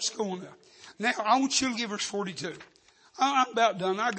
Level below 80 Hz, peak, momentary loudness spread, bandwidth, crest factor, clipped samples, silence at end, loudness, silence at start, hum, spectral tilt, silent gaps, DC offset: -72 dBFS; -10 dBFS; 15 LU; 8.8 kHz; 18 dB; under 0.1%; 0 s; -28 LUFS; 0 s; none; -2.5 dB/octave; none; under 0.1%